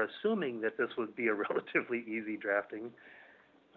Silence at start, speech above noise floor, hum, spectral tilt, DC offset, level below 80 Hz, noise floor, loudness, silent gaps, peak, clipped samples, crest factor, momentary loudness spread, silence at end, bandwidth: 0 s; 27 dB; none; -3.5 dB/octave; under 0.1%; -84 dBFS; -62 dBFS; -35 LUFS; none; -16 dBFS; under 0.1%; 20 dB; 12 LU; 0.45 s; 4.5 kHz